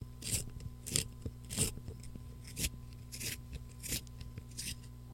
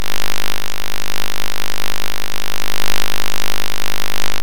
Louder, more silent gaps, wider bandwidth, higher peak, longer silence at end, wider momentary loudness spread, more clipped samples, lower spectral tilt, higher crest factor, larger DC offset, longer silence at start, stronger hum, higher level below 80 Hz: second, -40 LUFS vs -23 LUFS; neither; about the same, 16.5 kHz vs 17.5 kHz; second, -12 dBFS vs -2 dBFS; about the same, 0 s vs 0 s; first, 14 LU vs 4 LU; neither; about the same, -2.5 dB/octave vs -2 dB/octave; first, 30 dB vs 22 dB; second, under 0.1% vs 40%; about the same, 0 s vs 0 s; about the same, 60 Hz at -50 dBFS vs 50 Hz at -40 dBFS; second, -50 dBFS vs -40 dBFS